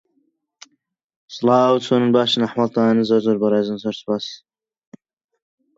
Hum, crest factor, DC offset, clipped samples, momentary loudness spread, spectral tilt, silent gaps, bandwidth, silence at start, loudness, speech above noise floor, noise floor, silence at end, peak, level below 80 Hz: none; 18 dB; under 0.1%; under 0.1%; 10 LU; -6 dB/octave; none; 7.8 kHz; 1.3 s; -18 LUFS; 52 dB; -69 dBFS; 1.4 s; -2 dBFS; -68 dBFS